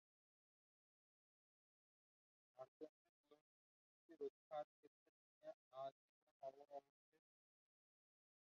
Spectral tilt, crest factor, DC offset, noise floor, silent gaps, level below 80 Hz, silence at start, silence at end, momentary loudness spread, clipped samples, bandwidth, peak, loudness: -4 dB/octave; 22 dB; under 0.1%; under -90 dBFS; 2.68-2.80 s, 2.89-3.24 s, 3.41-4.09 s, 4.30-4.51 s, 4.64-5.41 s, 5.54-5.71 s, 5.92-6.40 s; under -90 dBFS; 2.55 s; 1.65 s; 9 LU; under 0.1%; 6.6 kHz; -40 dBFS; -58 LUFS